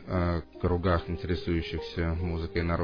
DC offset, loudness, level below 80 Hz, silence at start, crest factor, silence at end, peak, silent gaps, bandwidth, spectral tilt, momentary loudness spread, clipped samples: under 0.1%; -30 LUFS; -40 dBFS; 0 s; 16 dB; 0 s; -14 dBFS; none; 5.4 kHz; -8.5 dB/octave; 4 LU; under 0.1%